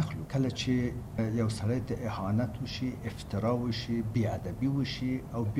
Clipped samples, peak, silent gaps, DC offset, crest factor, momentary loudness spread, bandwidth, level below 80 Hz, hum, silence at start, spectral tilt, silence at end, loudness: under 0.1%; -18 dBFS; none; under 0.1%; 14 dB; 5 LU; 15 kHz; -48 dBFS; none; 0 s; -7 dB/octave; 0 s; -32 LUFS